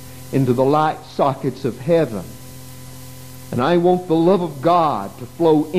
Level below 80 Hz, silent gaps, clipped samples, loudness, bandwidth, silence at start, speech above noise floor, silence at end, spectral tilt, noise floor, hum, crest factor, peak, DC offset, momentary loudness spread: -52 dBFS; none; under 0.1%; -18 LUFS; 15.5 kHz; 0 s; 20 dB; 0 s; -7 dB/octave; -37 dBFS; none; 16 dB; -2 dBFS; 0.8%; 21 LU